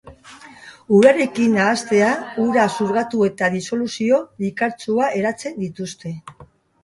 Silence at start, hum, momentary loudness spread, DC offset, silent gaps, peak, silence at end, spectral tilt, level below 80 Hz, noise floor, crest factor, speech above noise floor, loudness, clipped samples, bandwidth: 0.05 s; none; 14 LU; under 0.1%; none; 0 dBFS; 0.4 s; -5.5 dB/octave; -60 dBFS; -43 dBFS; 18 dB; 25 dB; -19 LUFS; under 0.1%; 11.5 kHz